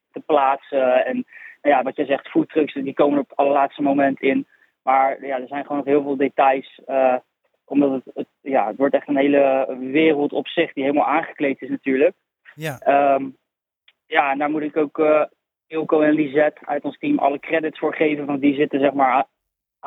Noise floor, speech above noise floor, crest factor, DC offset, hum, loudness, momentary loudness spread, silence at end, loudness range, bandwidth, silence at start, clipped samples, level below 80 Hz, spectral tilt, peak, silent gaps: -79 dBFS; 60 dB; 18 dB; under 0.1%; none; -20 LUFS; 9 LU; 0 s; 2 LU; 7 kHz; 0.15 s; under 0.1%; -74 dBFS; -7 dB/octave; -2 dBFS; none